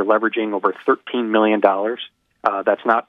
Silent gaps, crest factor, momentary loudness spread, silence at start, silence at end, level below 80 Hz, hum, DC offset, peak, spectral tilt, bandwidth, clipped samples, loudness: none; 18 dB; 8 LU; 0 s; 0.05 s; -72 dBFS; none; under 0.1%; 0 dBFS; -7 dB/octave; 5.8 kHz; under 0.1%; -19 LUFS